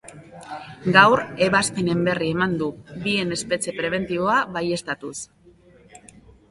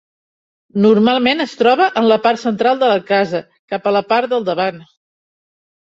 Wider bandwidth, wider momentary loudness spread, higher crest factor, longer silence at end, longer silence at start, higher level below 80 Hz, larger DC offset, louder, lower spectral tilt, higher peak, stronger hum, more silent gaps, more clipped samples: first, 11.5 kHz vs 7.8 kHz; first, 21 LU vs 9 LU; first, 22 dB vs 14 dB; second, 0.55 s vs 1 s; second, 0.05 s vs 0.75 s; first, -56 dBFS vs -62 dBFS; neither; second, -21 LUFS vs -15 LUFS; second, -4.5 dB/octave vs -6 dB/octave; about the same, 0 dBFS vs -2 dBFS; neither; second, none vs 3.59-3.68 s; neither